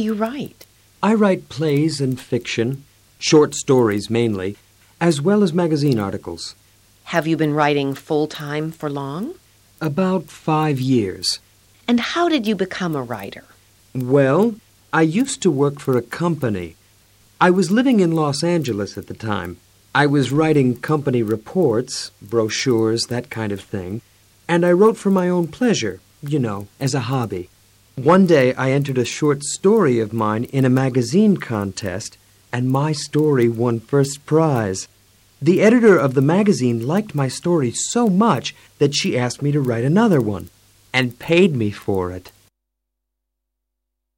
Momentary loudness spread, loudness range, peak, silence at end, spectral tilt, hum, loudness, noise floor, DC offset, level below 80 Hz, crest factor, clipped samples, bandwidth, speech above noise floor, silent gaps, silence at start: 13 LU; 5 LU; -2 dBFS; 1.9 s; -6 dB/octave; none; -19 LUFS; -79 dBFS; under 0.1%; -58 dBFS; 16 dB; under 0.1%; 16.5 kHz; 61 dB; none; 0 s